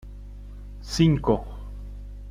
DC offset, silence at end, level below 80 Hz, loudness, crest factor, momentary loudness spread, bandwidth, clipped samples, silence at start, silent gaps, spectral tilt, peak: under 0.1%; 0 s; -38 dBFS; -23 LUFS; 20 dB; 22 LU; 12.5 kHz; under 0.1%; 0 s; none; -6.5 dB/octave; -6 dBFS